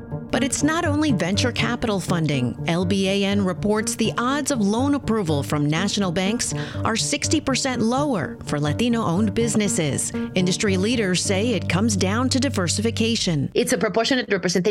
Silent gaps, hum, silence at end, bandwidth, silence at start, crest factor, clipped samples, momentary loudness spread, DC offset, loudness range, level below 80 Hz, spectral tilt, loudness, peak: none; none; 0 s; 16 kHz; 0 s; 14 dB; under 0.1%; 3 LU; under 0.1%; 1 LU; -48 dBFS; -4.5 dB/octave; -21 LUFS; -6 dBFS